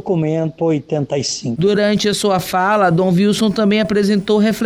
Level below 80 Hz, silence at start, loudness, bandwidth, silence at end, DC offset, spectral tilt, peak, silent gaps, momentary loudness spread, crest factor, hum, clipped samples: -50 dBFS; 0.05 s; -16 LUFS; 16 kHz; 0 s; under 0.1%; -5.5 dB/octave; -4 dBFS; none; 5 LU; 10 dB; none; under 0.1%